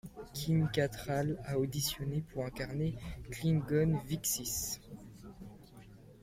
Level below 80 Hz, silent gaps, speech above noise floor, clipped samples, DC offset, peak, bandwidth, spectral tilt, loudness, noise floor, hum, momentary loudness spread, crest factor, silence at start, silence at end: -54 dBFS; none; 21 dB; under 0.1%; under 0.1%; -18 dBFS; 16.5 kHz; -5 dB/octave; -35 LUFS; -55 dBFS; none; 20 LU; 18 dB; 0.05 s; 0 s